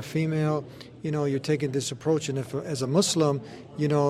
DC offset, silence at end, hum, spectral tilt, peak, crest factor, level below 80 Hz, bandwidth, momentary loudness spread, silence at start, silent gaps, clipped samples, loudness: under 0.1%; 0 s; none; -5.5 dB/octave; -10 dBFS; 16 dB; -64 dBFS; 15 kHz; 9 LU; 0 s; none; under 0.1%; -27 LUFS